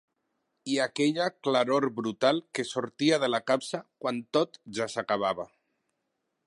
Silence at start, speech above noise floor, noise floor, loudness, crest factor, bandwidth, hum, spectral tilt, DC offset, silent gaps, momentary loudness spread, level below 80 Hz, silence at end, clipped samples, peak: 0.65 s; 52 dB; -81 dBFS; -29 LUFS; 20 dB; 11.5 kHz; none; -4.5 dB/octave; under 0.1%; none; 9 LU; -76 dBFS; 1 s; under 0.1%; -10 dBFS